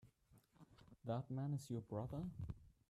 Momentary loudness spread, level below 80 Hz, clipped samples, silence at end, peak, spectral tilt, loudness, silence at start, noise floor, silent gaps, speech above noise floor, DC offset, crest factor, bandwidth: 12 LU; -66 dBFS; under 0.1%; 0.2 s; -34 dBFS; -8 dB/octave; -48 LUFS; 0.05 s; -73 dBFS; none; 28 dB; under 0.1%; 14 dB; 14 kHz